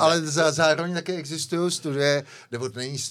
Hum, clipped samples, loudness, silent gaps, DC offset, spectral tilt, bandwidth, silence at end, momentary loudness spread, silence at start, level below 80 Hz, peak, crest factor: none; under 0.1%; -24 LUFS; none; under 0.1%; -4 dB/octave; 15 kHz; 0 s; 11 LU; 0 s; -82 dBFS; -6 dBFS; 18 dB